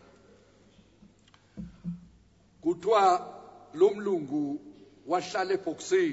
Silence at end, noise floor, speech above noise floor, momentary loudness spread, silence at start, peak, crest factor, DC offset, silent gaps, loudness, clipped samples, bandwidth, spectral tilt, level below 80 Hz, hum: 0 s; -61 dBFS; 34 dB; 22 LU; 1.55 s; -10 dBFS; 20 dB; under 0.1%; none; -28 LUFS; under 0.1%; 8 kHz; -5 dB/octave; -64 dBFS; none